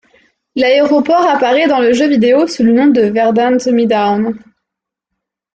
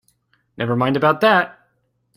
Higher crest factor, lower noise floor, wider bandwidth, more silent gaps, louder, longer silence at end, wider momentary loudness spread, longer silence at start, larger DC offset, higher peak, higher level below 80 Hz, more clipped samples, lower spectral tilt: second, 10 dB vs 18 dB; first, -80 dBFS vs -67 dBFS; second, 8.8 kHz vs 15.5 kHz; neither; first, -11 LUFS vs -18 LUFS; first, 1.15 s vs 0.65 s; second, 5 LU vs 12 LU; about the same, 0.55 s vs 0.6 s; neither; about the same, -2 dBFS vs -2 dBFS; first, -56 dBFS vs -62 dBFS; neither; second, -5.5 dB/octave vs -7 dB/octave